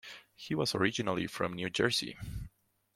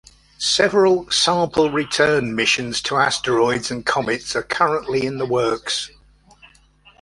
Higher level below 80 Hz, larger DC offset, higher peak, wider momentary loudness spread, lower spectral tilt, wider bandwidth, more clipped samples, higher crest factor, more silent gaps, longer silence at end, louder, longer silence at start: about the same, -56 dBFS vs -52 dBFS; neither; second, -12 dBFS vs -2 dBFS; first, 17 LU vs 7 LU; about the same, -4 dB/octave vs -3 dB/octave; first, 16.5 kHz vs 11.5 kHz; neither; about the same, 22 dB vs 18 dB; neither; second, 0.5 s vs 1.15 s; second, -33 LUFS vs -19 LUFS; second, 0.05 s vs 0.4 s